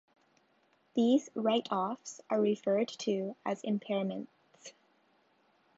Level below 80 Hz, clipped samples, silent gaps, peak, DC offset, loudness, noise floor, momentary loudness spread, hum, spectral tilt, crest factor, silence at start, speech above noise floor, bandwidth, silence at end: -86 dBFS; under 0.1%; none; -16 dBFS; under 0.1%; -33 LUFS; -71 dBFS; 22 LU; none; -5.5 dB/octave; 18 dB; 0.95 s; 39 dB; 8 kHz; 1.1 s